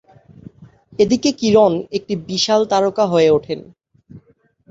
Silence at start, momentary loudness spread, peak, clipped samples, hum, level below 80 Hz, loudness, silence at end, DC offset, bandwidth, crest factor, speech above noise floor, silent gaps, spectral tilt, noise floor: 0.6 s; 11 LU; -2 dBFS; under 0.1%; none; -54 dBFS; -16 LUFS; 0.55 s; under 0.1%; 7.8 kHz; 16 dB; 40 dB; none; -5 dB/octave; -56 dBFS